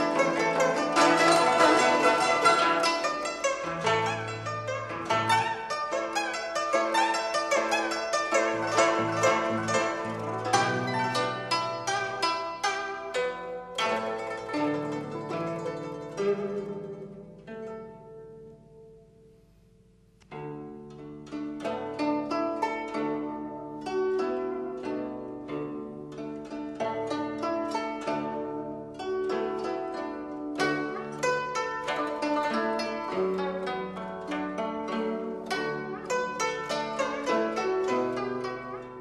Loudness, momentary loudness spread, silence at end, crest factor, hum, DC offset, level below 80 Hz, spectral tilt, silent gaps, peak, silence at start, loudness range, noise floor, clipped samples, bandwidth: -28 LUFS; 14 LU; 0 s; 20 dB; none; under 0.1%; -64 dBFS; -3.5 dB/octave; none; -8 dBFS; 0 s; 11 LU; -59 dBFS; under 0.1%; 13 kHz